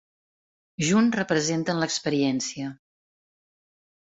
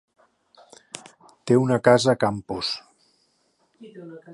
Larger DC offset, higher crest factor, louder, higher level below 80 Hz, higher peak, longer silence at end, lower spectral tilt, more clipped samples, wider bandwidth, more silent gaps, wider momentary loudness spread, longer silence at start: neither; second, 18 dB vs 24 dB; second, -24 LUFS vs -21 LUFS; about the same, -64 dBFS vs -60 dBFS; second, -10 dBFS vs -2 dBFS; first, 1.3 s vs 0 s; about the same, -4.5 dB/octave vs -5.5 dB/octave; neither; second, 8.2 kHz vs 11.5 kHz; neither; second, 13 LU vs 24 LU; second, 0.8 s vs 1.45 s